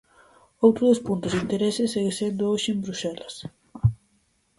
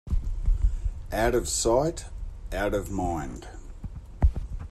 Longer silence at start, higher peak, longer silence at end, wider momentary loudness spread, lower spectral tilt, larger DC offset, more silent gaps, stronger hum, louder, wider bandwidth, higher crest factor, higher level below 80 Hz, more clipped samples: first, 0.6 s vs 0.05 s; first, -4 dBFS vs -10 dBFS; first, 0.65 s vs 0 s; about the same, 16 LU vs 18 LU; about the same, -6 dB/octave vs -5 dB/octave; neither; neither; neither; first, -24 LUFS vs -28 LUFS; second, 11.5 kHz vs 13.5 kHz; about the same, 20 dB vs 18 dB; second, -48 dBFS vs -30 dBFS; neither